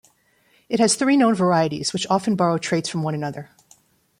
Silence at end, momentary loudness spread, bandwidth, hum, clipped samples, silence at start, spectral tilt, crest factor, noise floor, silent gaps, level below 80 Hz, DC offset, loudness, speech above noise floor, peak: 0.75 s; 10 LU; 15 kHz; none; under 0.1%; 0.7 s; -4.5 dB/octave; 16 dB; -61 dBFS; none; -64 dBFS; under 0.1%; -20 LUFS; 41 dB; -6 dBFS